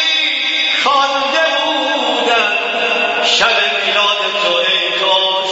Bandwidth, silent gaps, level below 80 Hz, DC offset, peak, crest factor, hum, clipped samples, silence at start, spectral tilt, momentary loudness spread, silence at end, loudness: 8 kHz; none; -60 dBFS; under 0.1%; 0 dBFS; 14 dB; none; under 0.1%; 0 s; -0.5 dB/octave; 3 LU; 0 s; -12 LUFS